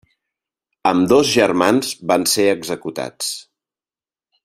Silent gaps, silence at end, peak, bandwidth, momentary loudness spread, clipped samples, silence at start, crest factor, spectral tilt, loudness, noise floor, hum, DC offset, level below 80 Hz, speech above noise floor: none; 1.05 s; 0 dBFS; 16 kHz; 11 LU; under 0.1%; 0.85 s; 18 dB; -3.5 dB/octave; -17 LUFS; under -90 dBFS; none; under 0.1%; -58 dBFS; over 73 dB